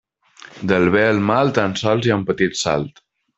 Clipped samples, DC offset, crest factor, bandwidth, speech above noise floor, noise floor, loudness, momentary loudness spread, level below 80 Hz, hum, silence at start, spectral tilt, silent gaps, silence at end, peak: under 0.1%; under 0.1%; 18 dB; 8.2 kHz; 28 dB; -45 dBFS; -18 LUFS; 7 LU; -52 dBFS; none; 0.55 s; -5.5 dB/octave; none; 0.5 s; 0 dBFS